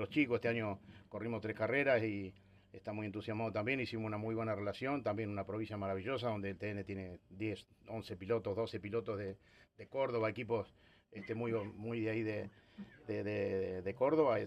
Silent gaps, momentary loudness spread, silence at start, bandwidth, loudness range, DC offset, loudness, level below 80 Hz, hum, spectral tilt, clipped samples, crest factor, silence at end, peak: none; 16 LU; 0 s; 10.5 kHz; 4 LU; under 0.1%; -39 LUFS; -72 dBFS; none; -8 dB/octave; under 0.1%; 18 dB; 0 s; -20 dBFS